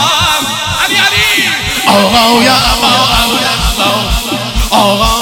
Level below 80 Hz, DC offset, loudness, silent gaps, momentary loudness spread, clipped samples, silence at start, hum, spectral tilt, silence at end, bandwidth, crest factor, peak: -22 dBFS; under 0.1%; -8 LUFS; none; 6 LU; 0.4%; 0 s; none; -2.5 dB/octave; 0 s; over 20 kHz; 10 dB; 0 dBFS